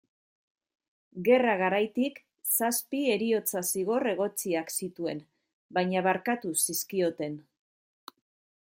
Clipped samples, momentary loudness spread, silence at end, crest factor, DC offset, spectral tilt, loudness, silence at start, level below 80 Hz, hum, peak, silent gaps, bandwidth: under 0.1%; 11 LU; 1.25 s; 20 dB; under 0.1%; -3.5 dB/octave; -28 LUFS; 1.15 s; -78 dBFS; none; -10 dBFS; 5.53-5.69 s; 17 kHz